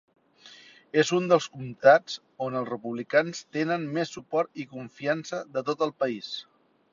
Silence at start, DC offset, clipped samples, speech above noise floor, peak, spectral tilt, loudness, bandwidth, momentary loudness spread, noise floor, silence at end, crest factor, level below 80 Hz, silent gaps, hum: 0.45 s; under 0.1%; under 0.1%; 26 dB; -4 dBFS; -5 dB/octave; -27 LUFS; 7.6 kHz; 14 LU; -53 dBFS; 0.5 s; 22 dB; -74 dBFS; none; none